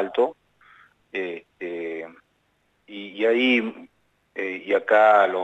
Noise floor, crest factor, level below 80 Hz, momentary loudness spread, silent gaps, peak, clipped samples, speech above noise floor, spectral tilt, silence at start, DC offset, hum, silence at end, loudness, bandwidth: -68 dBFS; 18 dB; -76 dBFS; 21 LU; none; -6 dBFS; under 0.1%; 46 dB; -5 dB/octave; 0 s; under 0.1%; none; 0 s; -22 LUFS; 8 kHz